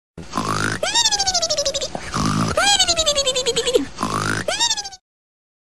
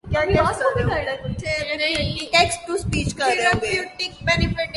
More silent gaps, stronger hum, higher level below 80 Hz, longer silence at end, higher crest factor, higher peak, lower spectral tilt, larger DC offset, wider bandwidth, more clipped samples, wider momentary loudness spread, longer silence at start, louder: neither; neither; second, -42 dBFS vs -36 dBFS; first, 0.65 s vs 0 s; about the same, 16 dB vs 20 dB; about the same, -4 dBFS vs -2 dBFS; second, -2 dB/octave vs -4 dB/octave; first, 1% vs under 0.1%; first, 14 kHz vs 11.5 kHz; neither; first, 10 LU vs 7 LU; about the same, 0.15 s vs 0.05 s; first, -18 LUFS vs -21 LUFS